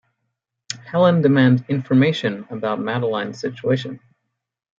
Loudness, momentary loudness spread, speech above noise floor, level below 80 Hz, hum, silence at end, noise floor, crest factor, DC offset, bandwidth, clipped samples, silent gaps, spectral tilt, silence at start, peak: -19 LUFS; 15 LU; 58 dB; -64 dBFS; none; 0.8 s; -77 dBFS; 18 dB; under 0.1%; 7.6 kHz; under 0.1%; none; -7 dB/octave; 0.7 s; -2 dBFS